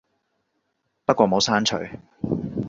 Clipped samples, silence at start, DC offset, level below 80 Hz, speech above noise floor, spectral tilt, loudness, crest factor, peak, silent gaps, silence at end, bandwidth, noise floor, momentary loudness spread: under 0.1%; 1.1 s; under 0.1%; -54 dBFS; 53 dB; -4 dB/octave; -22 LUFS; 22 dB; -2 dBFS; none; 0 s; 8 kHz; -74 dBFS; 13 LU